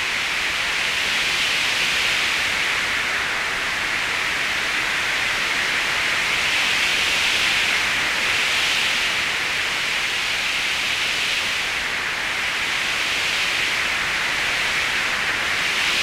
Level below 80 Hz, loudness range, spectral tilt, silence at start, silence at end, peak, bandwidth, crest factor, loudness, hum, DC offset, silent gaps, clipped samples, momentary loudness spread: -48 dBFS; 2 LU; 0 dB/octave; 0 s; 0 s; -8 dBFS; 16 kHz; 14 dB; -19 LUFS; none; under 0.1%; none; under 0.1%; 3 LU